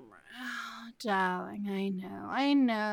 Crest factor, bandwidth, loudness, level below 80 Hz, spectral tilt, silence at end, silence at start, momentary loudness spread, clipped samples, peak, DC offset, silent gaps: 14 dB; 16.5 kHz; -32 LUFS; -78 dBFS; -5.5 dB/octave; 0 s; 0 s; 15 LU; under 0.1%; -18 dBFS; under 0.1%; none